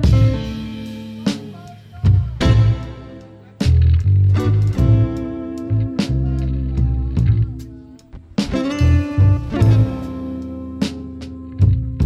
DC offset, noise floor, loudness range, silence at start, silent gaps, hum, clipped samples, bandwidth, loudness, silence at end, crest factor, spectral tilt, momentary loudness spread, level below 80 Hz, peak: under 0.1%; -39 dBFS; 4 LU; 0 s; none; none; under 0.1%; 9.2 kHz; -18 LUFS; 0 s; 14 dB; -8 dB/octave; 16 LU; -24 dBFS; -4 dBFS